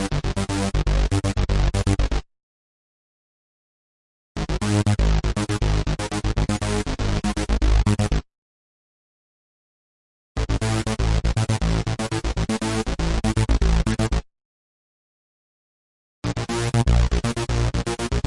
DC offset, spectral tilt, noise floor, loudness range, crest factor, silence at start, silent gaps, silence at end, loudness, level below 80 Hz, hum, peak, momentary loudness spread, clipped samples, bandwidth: under 0.1%; -5.5 dB/octave; under -90 dBFS; 5 LU; 16 dB; 0 s; 2.43-4.35 s, 8.38-10.35 s, 14.45-16.22 s; 0.05 s; -23 LUFS; -26 dBFS; none; -8 dBFS; 6 LU; under 0.1%; 11.5 kHz